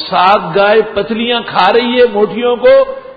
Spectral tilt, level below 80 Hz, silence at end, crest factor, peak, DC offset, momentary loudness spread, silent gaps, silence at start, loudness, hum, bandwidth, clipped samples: -6.5 dB/octave; -46 dBFS; 0.05 s; 10 dB; 0 dBFS; under 0.1%; 6 LU; none; 0 s; -10 LUFS; none; 5 kHz; under 0.1%